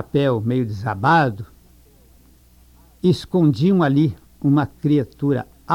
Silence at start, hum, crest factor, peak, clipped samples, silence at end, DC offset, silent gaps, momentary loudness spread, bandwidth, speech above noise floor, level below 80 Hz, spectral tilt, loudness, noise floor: 0 s; none; 16 dB; -4 dBFS; under 0.1%; 0 s; under 0.1%; none; 8 LU; 15.5 kHz; 33 dB; -50 dBFS; -8 dB/octave; -19 LUFS; -51 dBFS